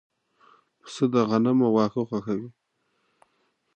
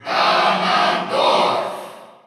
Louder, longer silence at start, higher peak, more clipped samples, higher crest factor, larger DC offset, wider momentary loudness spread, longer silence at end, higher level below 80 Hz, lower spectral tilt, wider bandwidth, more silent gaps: second, -24 LUFS vs -17 LUFS; first, 0.85 s vs 0.05 s; second, -8 dBFS vs -4 dBFS; neither; about the same, 18 dB vs 14 dB; neither; about the same, 13 LU vs 14 LU; first, 1.25 s vs 0.2 s; first, -70 dBFS vs -78 dBFS; first, -7.5 dB/octave vs -3.5 dB/octave; second, 9 kHz vs 14 kHz; neither